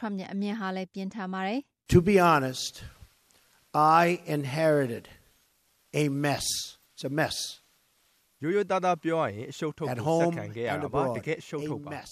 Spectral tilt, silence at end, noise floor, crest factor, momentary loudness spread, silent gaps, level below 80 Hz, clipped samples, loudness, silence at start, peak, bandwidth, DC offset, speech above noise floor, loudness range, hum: -5 dB/octave; 0 s; -68 dBFS; 20 dB; 14 LU; none; -54 dBFS; under 0.1%; -28 LUFS; 0 s; -8 dBFS; 14.5 kHz; under 0.1%; 41 dB; 5 LU; none